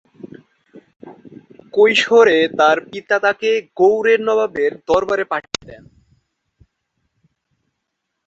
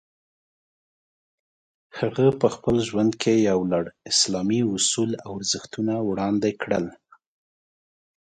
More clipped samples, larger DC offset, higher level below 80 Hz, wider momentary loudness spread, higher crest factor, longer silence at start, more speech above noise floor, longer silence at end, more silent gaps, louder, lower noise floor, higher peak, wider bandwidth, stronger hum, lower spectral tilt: neither; neither; about the same, -58 dBFS vs -58 dBFS; first, 11 LU vs 7 LU; about the same, 18 dB vs 20 dB; second, 0.25 s vs 1.95 s; second, 61 dB vs over 67 dB; first, 2.5 s vs 1.35 s; first, 0.96-1.00 s vs none; first, -15 LUFS vs -23 LUFS; second, -76 dBFS vs under -90 dBFS; first, 0 dBFS vs -6 dBFS; second, 8 kHz vs 9.6 kHz; neither; about the same, -3.5 dB/octave vs -4 dB/octave